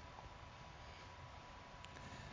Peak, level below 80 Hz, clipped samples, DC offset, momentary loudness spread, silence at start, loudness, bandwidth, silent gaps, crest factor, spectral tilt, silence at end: -36 dBFS; -62 dBFS; under 0.1%; under 0.1%; 3 LU; 0 s; -56 LUFS; 7.8 kHz; none; 20 dB; -4.5 dB/octave; 0 s